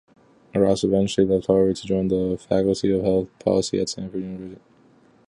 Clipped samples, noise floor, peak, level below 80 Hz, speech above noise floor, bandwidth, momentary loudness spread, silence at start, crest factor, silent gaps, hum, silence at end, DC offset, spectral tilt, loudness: under 0.1%; -55 dBFS; -4 dBFS; -48 dBFS; 34 dB; 11 kHz; 11 LU; 0.55 s; 18 dB; none; none; 0.75 s; under 0.1%; -6.5 dB/octave; -22 LUFS